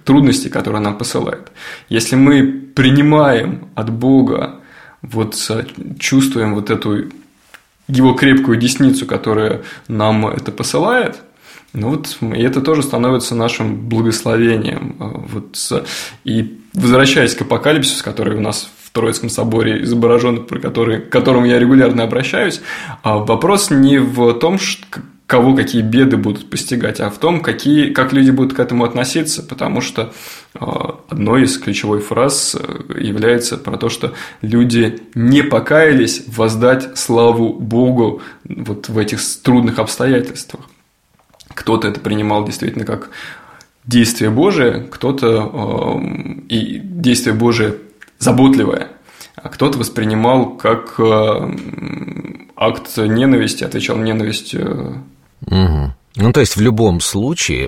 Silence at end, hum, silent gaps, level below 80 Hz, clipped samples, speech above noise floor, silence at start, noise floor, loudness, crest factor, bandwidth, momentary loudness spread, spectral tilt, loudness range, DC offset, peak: 0 s; none; none; -40 dBFS; under 0.1%; 42 dB; 0.05 s; -56 dBFS; -14 LUFS; 14 dB; 15.5 kHz; 13 LU; -5 dB/octave; 4 LU; under 0.1%; 0 dBFS